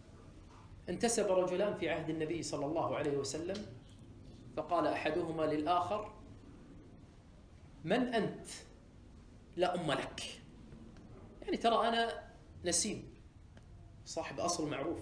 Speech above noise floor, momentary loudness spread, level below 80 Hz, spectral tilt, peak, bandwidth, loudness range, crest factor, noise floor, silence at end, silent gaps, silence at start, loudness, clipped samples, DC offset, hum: 22 dB; 23 LU; -60 dBFS; -4 dB/octave; -18 dBFS; 10.5 kHz; 5 LU; 20 dB; -58 dBFS; 0 s; none; 0.05 s; -36 LUFS; under 0.1%; under 0.1%; none